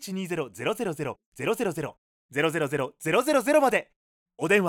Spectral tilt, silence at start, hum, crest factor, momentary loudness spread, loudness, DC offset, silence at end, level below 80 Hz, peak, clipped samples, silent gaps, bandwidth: -5 dB/octave; 0 s; none; 18 dB; 12 LU; -27 LUFS; under 0.1%; 0 s; -66 dBFS; -8 dBFS; under 0.1%; 1.26-1.32 s, 1.98-2.29 s, 3.96-4.26 s; 19 kHz